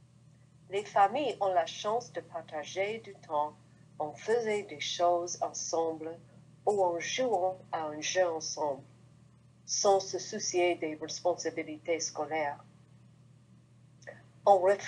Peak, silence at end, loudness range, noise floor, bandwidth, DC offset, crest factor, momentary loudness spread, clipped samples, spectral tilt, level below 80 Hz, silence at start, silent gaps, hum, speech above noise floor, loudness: -10 dBFS; 0 s; 3 LU; -60 dBFS; 10.5 kHz; under 0.1%; 22 dB; 14 LU; under 0.1%; -2.5 dB/octave; -80 dBFS; 0.7 s; none; none; 28 dB; -32 LUFS